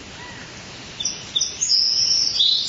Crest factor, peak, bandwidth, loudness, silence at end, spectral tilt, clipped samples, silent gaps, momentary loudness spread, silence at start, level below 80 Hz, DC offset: 16 dB; -6 dBFS; 8 kHz; -18 LUFS; 0 s; 1 dB/octave; under 0.1%; none; 20 LU; 0 s; -54 dBFS; under 0.1%